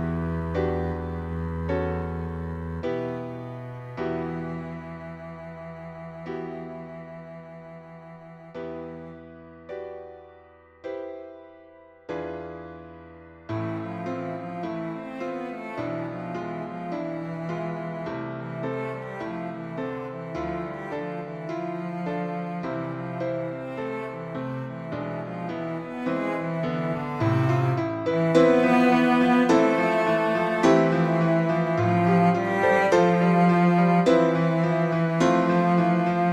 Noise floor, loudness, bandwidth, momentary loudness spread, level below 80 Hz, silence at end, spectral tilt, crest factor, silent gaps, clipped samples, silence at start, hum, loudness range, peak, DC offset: -52 dBFS; -25 LUFS; 9.2 kHz; 20 LU; -50 dBFS; 0 s; -7.5 dB/octave; 20 dB; none; under 0.1%; 0 s; none; 18 LU; -6 dBFS; under 0.1%